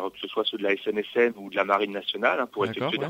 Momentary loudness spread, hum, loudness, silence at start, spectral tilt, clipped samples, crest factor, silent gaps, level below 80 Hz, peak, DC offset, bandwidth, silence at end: 4 LU; none; -26 LUFS; 0 s; -5.5 dB/octave; under 0.1%; 20 dB; none; -72 dBFS; -6 dBFS; under 0.1%; 16 kHz; 0 s